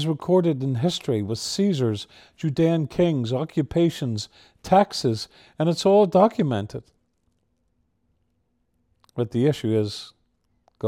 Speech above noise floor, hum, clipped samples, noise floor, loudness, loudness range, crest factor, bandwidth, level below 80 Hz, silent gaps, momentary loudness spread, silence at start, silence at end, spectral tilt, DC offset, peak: 49 dB; none; under 0.1%; -71 dBFS; -23 LUFS; 7 LU; 20 dB; 15 kHz; -56 dBFS; none; 14 LU; 0 s; 0 s; -6.5 dB/octave; under 0.1%; -4 dBFS